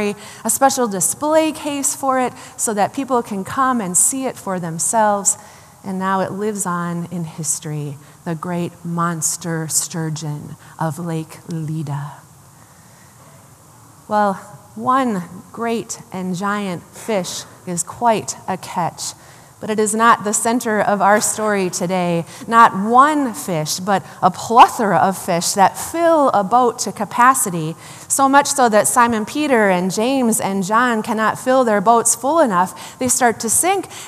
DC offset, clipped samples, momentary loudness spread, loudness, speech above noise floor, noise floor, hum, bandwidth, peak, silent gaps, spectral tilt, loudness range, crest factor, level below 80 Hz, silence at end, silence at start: under 0.1%; under 0.1%; 13 LU; -17 LUFS; 28 dB; -45 dBFS; none; 15 kHz; 0 dBFS; none; -3.5 dB/octave; 8 LU; 18 dB; -62 dBFS; 0 s; 0 s